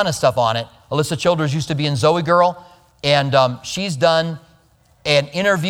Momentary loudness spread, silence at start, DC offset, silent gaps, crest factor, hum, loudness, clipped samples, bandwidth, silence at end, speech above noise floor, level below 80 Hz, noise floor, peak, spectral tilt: 9 LU; 0 s; under 0.1%; none; 18 dB; none; -18 LUFS; under 0.1%; 16.5 kHz; 0 s; 37 dB; -52 dBFS; -55 dBFS; 0 dBFS; -5 dB/octave